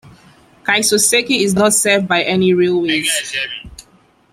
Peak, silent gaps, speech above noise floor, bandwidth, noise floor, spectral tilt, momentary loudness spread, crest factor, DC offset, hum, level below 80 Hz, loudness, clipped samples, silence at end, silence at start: -2 dBFS; none; 37 dB; 16 kHz; -52 dBFS; -2.5 dB/octave; 10 LU; 14 dB; under 0.1%; none; -50 dBFS; -14 LUFS; under 0.1%; 0.5 s; 0.05 s